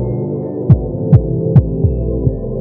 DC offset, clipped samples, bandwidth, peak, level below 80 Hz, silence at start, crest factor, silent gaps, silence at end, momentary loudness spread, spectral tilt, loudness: under 0.1%; 1%; 2.3 kHz; 0 dBFS; -24 dBFS; 0 s; 14 dB; none; 0 s; 7 LU; -13.5 dB/octave; -15 LUFS